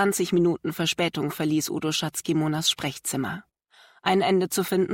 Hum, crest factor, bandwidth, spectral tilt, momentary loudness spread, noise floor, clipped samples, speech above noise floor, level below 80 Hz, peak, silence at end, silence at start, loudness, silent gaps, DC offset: none; 16 dB; 16.5 kHz; -4 dB/octave; 6 LU; -57 dBFS; under 0.1%; 32 dB; -64 dBFS; -10 dBFS; 0 s; 0 s; -25 LUFS; none; under 0.1%